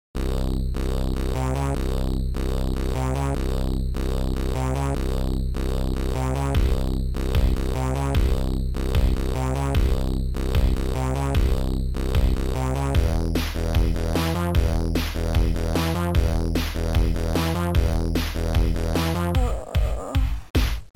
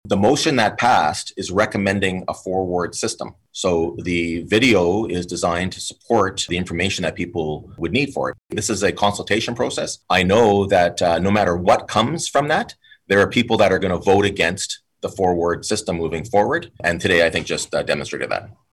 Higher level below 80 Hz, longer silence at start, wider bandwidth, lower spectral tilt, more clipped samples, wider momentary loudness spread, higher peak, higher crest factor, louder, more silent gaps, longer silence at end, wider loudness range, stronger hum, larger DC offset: first, -24 dBFS vs -48 dBFS; about the same, 0.15 s vs 0.05 s; first, 17 kHz vs 14.5 kHz; first, -6.5 dB/octave vs -4.5 dB/octave; neither; second, 4 LU vs 10 LU; about the same, -8 dBFS vs -6 dBFS; about the same, 14 dB vs 14 dB; second, -25 LUFS vs -19 LUFS; first, 20.50-20.54 s vs none; second, 0.1 s vs 0.25 s; about the same, 2 LU vs 4 LU; neither; first, 0.7% vs under 0.1%